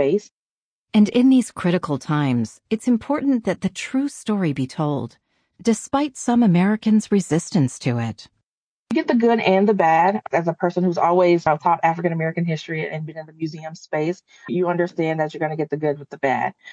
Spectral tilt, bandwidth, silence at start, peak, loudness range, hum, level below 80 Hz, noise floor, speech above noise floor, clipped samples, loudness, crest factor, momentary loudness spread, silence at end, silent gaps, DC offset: -6.5 dB/octave; 10.5 kHz; 0 s; -4 dBFS; 6 LU; none; -62 dBFS; under -90 dBFS; over 70 dB; under 0.1%; -20 LUFS; 16 dB; 10 LU; 0 s; 0.31-0.87 s, 8.44-8.85 s; under 0.1%